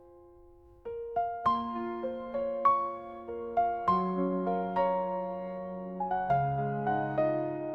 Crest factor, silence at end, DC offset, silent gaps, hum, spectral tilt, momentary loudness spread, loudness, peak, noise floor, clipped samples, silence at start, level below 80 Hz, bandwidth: 18 dB; 0 s; under 0.1%; none; none; -9.5 dB/octave; 11 LU; -31 LUFS; -14 dBFS; -56 dBFS; under 0.1%; 0 s; -62 dBFS; 5.8 kHz